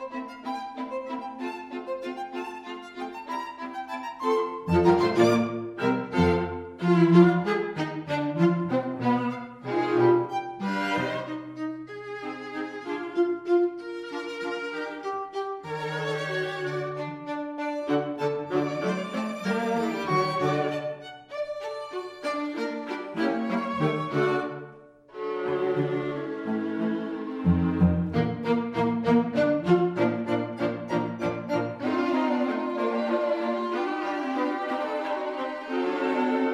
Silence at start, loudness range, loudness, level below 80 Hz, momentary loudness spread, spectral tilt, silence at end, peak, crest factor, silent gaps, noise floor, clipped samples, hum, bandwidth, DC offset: 0 s; 8 LU; -27 LUFS; -54 dBFS; 12 LU; -7.5 dB/octave; 0 s; -6 dBFS; 22 dB; none; -49 dBFS; under 0.1%; none; 11.5 kHz; under 0.1%